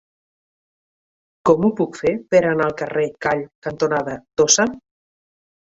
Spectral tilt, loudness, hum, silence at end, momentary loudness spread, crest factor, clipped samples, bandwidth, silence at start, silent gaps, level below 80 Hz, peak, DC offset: -3.5 dB/octave; -19 LUFS; none; 0.9 s; 8 LU; 20 dB; under 0.1%; 8 kHz; 1.45 s; 3.55-3.62 s; -56 dBFS; 0 dBFS; under 0.1%